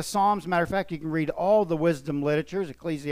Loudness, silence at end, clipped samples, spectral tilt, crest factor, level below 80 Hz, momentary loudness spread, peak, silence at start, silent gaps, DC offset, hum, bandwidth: -26 LUFS; 0 s; under 0.1%; -6 dB/octave; 14 dB; -54 dBFS; 9 LU; -12 dBFS; 0 s; none; under 0.1%; none; 15.5 kHz